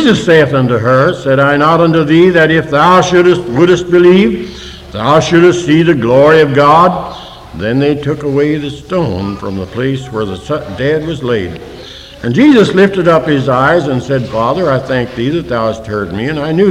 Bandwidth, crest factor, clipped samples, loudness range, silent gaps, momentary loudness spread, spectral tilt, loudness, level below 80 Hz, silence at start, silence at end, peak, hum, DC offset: 11 kHz; 10 dB; 0.7%; 7 LU; none; 13 LU; -6.5 dB/octave; -10 LUFS; -38 dBFS; 0 s; 0 s; 0 dBFS; none; under 0.1%